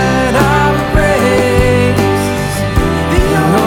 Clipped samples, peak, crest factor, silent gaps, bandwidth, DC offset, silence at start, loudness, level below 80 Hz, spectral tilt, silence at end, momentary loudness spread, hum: under 0.1%; 0 dBFS; 10 dB; none; 17 kHz; under 0.1%; 0 s; -11 LUFS; -22 dBFS; -6 dB/octave; 0 s; 4 LU; none